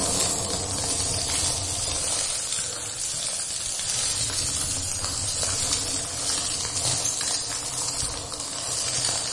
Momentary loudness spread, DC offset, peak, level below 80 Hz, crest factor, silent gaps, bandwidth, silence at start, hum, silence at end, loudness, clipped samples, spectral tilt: 4 LU; under 0.1%; -10 dBFS; -46 dBFS; 18 dB; none; 11.5 kHz; 0 s; none; 0 s; -24 LUFS; under 0.1%; -1 dB/octave